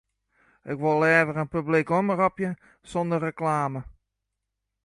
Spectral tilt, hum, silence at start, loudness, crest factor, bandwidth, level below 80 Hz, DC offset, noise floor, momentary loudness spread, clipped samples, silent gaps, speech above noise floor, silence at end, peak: -7.5 dB/octave; none; 0.65 s; -25 LUFS; 20 dB; 11.5 kHz; -58 dBFS; under 0.1%; -83 dBFS; 13 LU; under 0.1%; none; 58 dB; 0.95 s; -8 dBFS